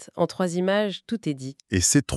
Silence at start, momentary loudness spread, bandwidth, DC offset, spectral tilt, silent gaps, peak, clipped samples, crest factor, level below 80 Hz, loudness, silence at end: 0 s; 10 LU; 13.5 kHz; under 0.1%; -4 dB/octave; none; -6 dBFS; under 0.1%; 18 dB; -50 dBFS; -25 LUFS; 0 s